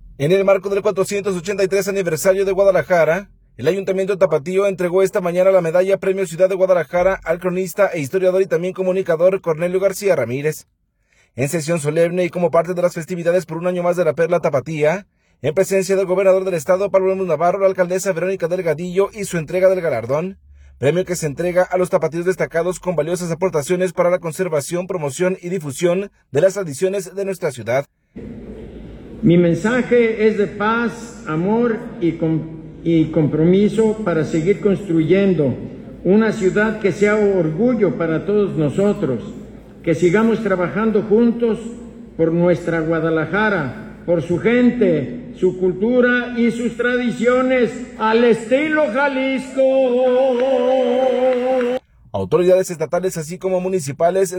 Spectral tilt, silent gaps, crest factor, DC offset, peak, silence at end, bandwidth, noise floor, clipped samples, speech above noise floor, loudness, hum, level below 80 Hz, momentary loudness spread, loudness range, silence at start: -6 dB/octave; none; 14 dB; under 0.1%; -2 dBFS; 0 s; 19 kHz; -60 dBFS; under 0.1%; 43 dB; -18 LUFS; none; -48 dBFS; 8 LU; 3 LU; 0 s